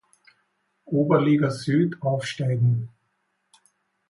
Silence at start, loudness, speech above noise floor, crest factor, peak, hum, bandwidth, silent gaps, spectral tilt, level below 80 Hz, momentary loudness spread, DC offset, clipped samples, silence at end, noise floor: 0.9 s; -23 LUFS; 51 dB; 18 dB; -6 dBFS; none; 11.5 kHz; none; -7.5 dB/octave; -64 dBFS; 8 LU; under 0.1%; under 0.1%; 1.2 s; -73 dBFS